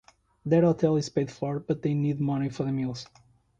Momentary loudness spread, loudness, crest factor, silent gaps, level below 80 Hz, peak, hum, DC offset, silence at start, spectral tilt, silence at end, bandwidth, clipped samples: 12 LU; -27 LUFS; 18 dB; none; -60 dBFS; -10 dBFS; none; under 0.1%; 0.45 s; -7.5 dB/octave; 0.55 s; 8.6 kHz; under 0.1%